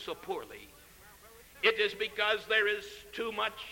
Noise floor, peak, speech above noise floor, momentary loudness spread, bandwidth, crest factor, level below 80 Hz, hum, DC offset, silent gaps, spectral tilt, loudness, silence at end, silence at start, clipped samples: -56 dBFS; -14 dBFS; 23 dB; 14 LU; 17 kHz; 20 dB; -64 dBFS; none; under 0.1%; none; -2 dB/octave; -31 LUFS; 0 s; 0 s; under 0.1%